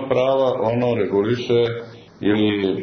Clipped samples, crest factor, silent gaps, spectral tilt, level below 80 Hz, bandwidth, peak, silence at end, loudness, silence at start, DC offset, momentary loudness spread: under 0.1%; 12 dB; none; -7.5 dB/octave; -56 dBFS; 6.6 kHz; -6 dBFS; 0 s; -20 LUFS; 0 s; under 0.1%; 6 LU